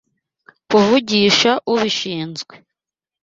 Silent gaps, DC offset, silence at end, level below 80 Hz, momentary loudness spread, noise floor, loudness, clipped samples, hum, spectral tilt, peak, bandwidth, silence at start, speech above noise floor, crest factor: none; under 0.1%; 0.65 s; -58 dBFS; 15 LU; -88 dBFS; -15 LUFS; under 0.1%; none; -4 dB/octave; 0 dBFS; 7.8 kHz; 0.7 s; 71 dB; 18 dB